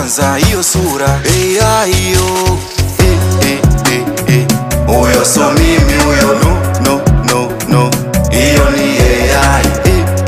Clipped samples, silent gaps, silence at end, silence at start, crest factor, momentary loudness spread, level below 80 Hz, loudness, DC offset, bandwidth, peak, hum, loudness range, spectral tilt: under 0.1%; none; 0 s; 0 s; 10 dB; 4 LU; -18 dBFS; -10 LUFS; under 0.1%; 16 kHz; 0 dBFS; none; 1 LU; -4.5 dB/octave